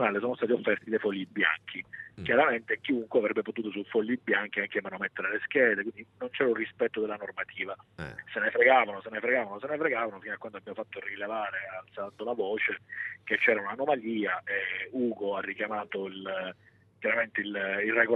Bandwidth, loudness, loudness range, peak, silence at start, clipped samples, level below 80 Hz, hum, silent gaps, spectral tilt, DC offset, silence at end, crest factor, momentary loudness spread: 5.4 kHz; -30 LUFS; 4 LU; -8 dBFS; 0 s; under 0.1%; -72 dBFS; none; none; -7 dB/octave; under 0.1%; 0 s; 22 dB; 14 LU